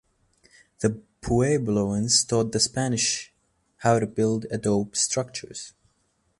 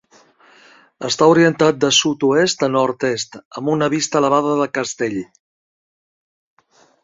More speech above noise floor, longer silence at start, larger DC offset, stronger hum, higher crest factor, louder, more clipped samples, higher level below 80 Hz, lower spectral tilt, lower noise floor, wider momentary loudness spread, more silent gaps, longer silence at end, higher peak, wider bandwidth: first, 46 dB vs 35 dB; second, 0.8 s vs 1 s; neither; neither; about the same, 20 dB vs 18 dB; second, -24 LUFS vs -17 LUFS; neither; first, -50 dBFS vs -60 dBFS; about the same, -4 dB/octave vs -4 dB/octave; first, -70 dBFS vs -51 dBFS; first, 15 LU vs 12 LU; second, none vs 3.45-3.51 s; second, 0.7 s vs 1.8 s; second, -6 dBFS vs -2 dBFS; first, 11.5 kHz vs 7.8 kHz